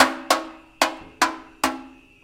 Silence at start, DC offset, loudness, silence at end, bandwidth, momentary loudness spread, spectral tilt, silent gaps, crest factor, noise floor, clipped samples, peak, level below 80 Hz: 0 s; under 0.1%; -24 LUFS; 0.35 s; 17 kHz; 7 LU; -1 dB/octave; none; 24 dB; -41 dBFS; under 0.1%; 0 dBFS; -56 dBFS